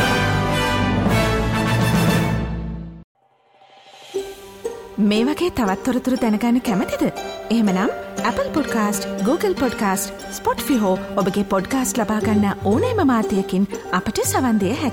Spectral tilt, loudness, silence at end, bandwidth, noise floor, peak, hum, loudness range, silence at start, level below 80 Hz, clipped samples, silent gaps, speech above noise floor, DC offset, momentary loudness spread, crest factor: -5.5 dB/octave; -20 LUFS; 0 s; 17.5 kHz; -55 dBFS; -6 dBFS; none; 4 LU; 0 s; -38 dBFS; under 0.1%; 3.04-3.15 s; 35 dB; under 0.1%; 10 LU; 14 dB